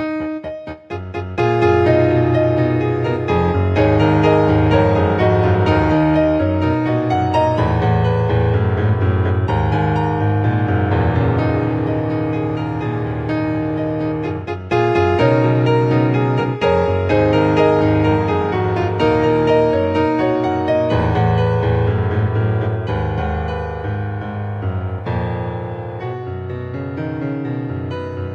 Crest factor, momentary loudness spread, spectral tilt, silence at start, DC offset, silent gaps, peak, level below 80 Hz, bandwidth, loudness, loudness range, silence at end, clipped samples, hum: 14 dB; 11 LU; -9 dB/octave; 0 s; under 0.1%; none; -2 dBFS; -34 dBFS; 7.2 kHz; -17 LUFS; 8 LU; 0 s; under 0.1%; none